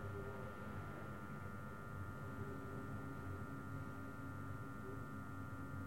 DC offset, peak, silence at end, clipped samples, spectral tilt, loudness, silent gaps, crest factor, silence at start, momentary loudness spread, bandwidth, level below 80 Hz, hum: 0.2%; -36 dBFS; 0 s; under 0.1%; -7.5 dB/octave; -50 LUFS; none; 12 dB; 0 s; 2 LU; 16.5 kHz; -64 dBFS; none